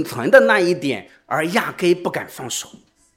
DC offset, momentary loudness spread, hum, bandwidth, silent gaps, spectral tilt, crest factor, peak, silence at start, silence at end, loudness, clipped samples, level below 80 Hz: under 0.1%; 15 LU; none; 16.5 kHz; none; -4 dB/octave; 18 dB; 0 dBFS; 0 s; 0.4 s; -18 LUFS; under 0.1%; -64 dBFS